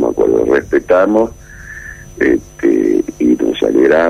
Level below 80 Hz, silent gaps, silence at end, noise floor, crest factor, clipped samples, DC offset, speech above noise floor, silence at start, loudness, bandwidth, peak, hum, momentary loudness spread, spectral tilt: -40 dBFS; none; 0 s; -31 dBFS; 10 dB; under 0.1%; under 0.1%; 20 dB; 0 s; -13 LUFS; 14 kHz; -2 dBFS; none; 18 LU; -6 dB/octave